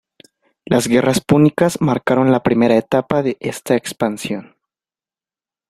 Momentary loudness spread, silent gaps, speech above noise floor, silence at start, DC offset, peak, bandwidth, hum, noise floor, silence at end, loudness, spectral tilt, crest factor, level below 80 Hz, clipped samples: 8 LU; none; over 74 dB; 0.7 s; under 0.1%; -2 dBFS; 14.5 kHz; none; under -90 dBFS; 1.25 s; -16 LUFS; -6 dB/octave; 16 dB; -52 dBFS; under 0.1%